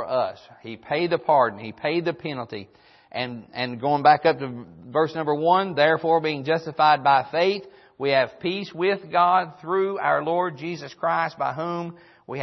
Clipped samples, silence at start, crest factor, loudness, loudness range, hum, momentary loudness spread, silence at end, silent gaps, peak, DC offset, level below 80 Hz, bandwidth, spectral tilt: under 0.1%; 0 s; 20 dB; -23 LUFS; 4 LU; none; 14 LU; 0 s; none; -4 dBFS; under 0.1%; -70 dBFS; 6.2 kHz; -6.5 dB/octave